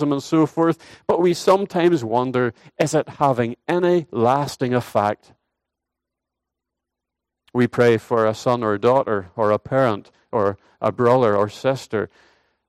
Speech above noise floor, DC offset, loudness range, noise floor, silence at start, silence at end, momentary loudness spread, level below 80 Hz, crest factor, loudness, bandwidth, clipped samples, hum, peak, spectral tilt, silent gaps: 64 dB; under 0.1%; 5 LU; -84 dBFS; 0 s; 0.65 s; 8 LU; -62 dBFS; 18 dB; -20 LUFS; 14.5 kHz; under 0.1%; none; -4 dBFS; -6.5 dB/octave; none